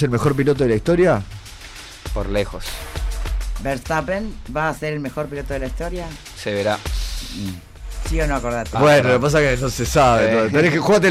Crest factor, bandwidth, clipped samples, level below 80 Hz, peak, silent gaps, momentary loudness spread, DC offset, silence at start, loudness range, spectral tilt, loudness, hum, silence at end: 12 dB; 16 kHz; under 0.1%; -30 dBFS; -6 dBFS; none; 16 LU; under 0.1%; 0 s; 9 LU; -5.5 dB/octave; -19 LUFS; none; 0 s